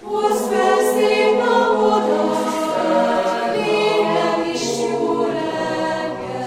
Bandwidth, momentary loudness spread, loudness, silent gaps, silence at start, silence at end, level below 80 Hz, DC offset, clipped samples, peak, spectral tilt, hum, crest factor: 16.5 kHz; 6 LU; -18 LUFS; none; 0 s; 0 s; -58 dBFS; under 0.1%; under 0.1%; -4 dBFS; -4 dB/octave; none; 14 dB